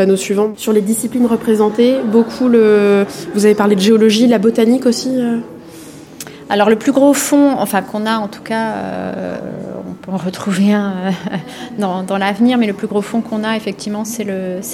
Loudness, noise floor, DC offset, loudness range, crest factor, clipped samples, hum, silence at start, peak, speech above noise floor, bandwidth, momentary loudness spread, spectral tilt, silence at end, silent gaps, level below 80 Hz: -14 LUFS; -34 dBFS; under 0.1%; 7 LU; 14 dB; under 0.1%; none; 0 s; 0 dBFS; 21 dB; 17 kHz; 14 LU; -5 dB/octave; 0 s; none; -56 dBFS